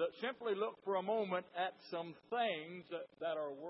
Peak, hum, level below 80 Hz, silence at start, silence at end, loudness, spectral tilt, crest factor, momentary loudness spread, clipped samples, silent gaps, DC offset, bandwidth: -24 dBFS; none; under -90 dBFS; 0 s; 0 s; -41 LUFS; -2.5 dB/octave; 16 dB; 8 LU; under 0.1%; none; under 0.1%; 5.6 kHz